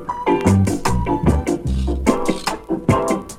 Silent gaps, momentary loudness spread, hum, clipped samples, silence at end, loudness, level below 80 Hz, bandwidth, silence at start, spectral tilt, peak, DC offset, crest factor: none; 6 LU; none; under 0.1%; 0 s; -19 LUFS; -28 dBFS; 16 kHz; 0 s; -6.5 dB/octave; -2 dBFS; under 0.1%; 16 dB